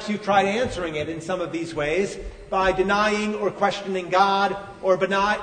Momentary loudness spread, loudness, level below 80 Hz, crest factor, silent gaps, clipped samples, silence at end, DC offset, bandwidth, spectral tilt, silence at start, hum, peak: 8 LU; -23 LUFS; -46 dBFS; 16 dB; none; under 0.1%; 0 s; under 0.1%; 9.6 kHz; -4.5 dB/octave; 0 s; none; -6 dBFS